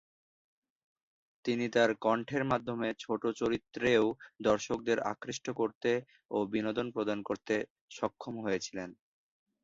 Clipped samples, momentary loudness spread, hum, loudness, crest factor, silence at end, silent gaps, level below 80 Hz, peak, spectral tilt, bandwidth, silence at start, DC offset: under 0.1%; 10 LU; none; -33 LUFS; 20 dB; 0.7 s; 5.75-5.81 s, 7.70-7.88 s; -68 dBFS; -12 dBFS; -5 dB/octave; 7.8 kHz; 1.45 s; under 0.1%